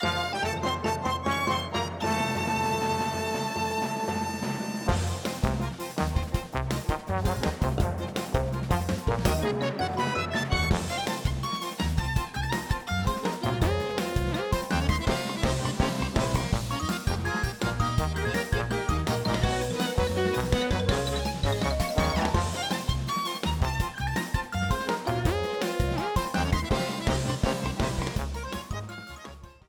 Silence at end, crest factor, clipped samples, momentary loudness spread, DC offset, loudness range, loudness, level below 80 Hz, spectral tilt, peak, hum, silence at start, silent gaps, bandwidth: 0.15 s; 18 dB; under 0.1%; 4 LU; under 0.1%; 2 LU; -28 LUFS; -36 dBFS; -5 dB/octave; -8 dBFS; none; 0 s; none; 19.5 kHz